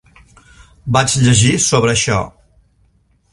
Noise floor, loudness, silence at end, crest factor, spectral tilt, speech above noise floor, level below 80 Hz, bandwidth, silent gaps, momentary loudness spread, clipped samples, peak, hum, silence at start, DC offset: -56 dBFS; -13 LUFS; 1.05 s; 16 dB; -4 dB/octave; 43 dB; -40 dBFS; 11.5 kHz; none; 12 LU; under 0.1%; 0 dBFS; none; 0.85 s; under 0.1%